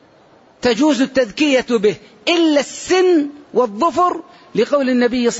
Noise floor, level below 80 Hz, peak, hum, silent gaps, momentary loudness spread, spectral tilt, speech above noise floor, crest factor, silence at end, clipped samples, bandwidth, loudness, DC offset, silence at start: -49 dBFS; -54 dBFS; -4 dBFS; none; none; 6 LU; -4 dB/octave; 33 dB; 12 dB; 0 s; under 0.1%; 8 kHz; -16 LUFS; under 0.1%; 0.65 s